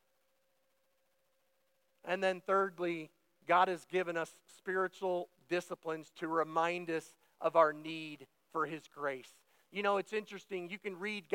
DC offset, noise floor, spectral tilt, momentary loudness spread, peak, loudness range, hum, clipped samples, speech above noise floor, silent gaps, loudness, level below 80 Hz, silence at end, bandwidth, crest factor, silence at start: under 0.1%; -79 dBFS; -5 dB/octave; 14 LU; -14 dBFS; 4 LU; none; under 0.1%; 43 dB; none; -36 LUFS; under -90 dBFS; 0 s; 16.5 kHz; 24 dB; 2.05 s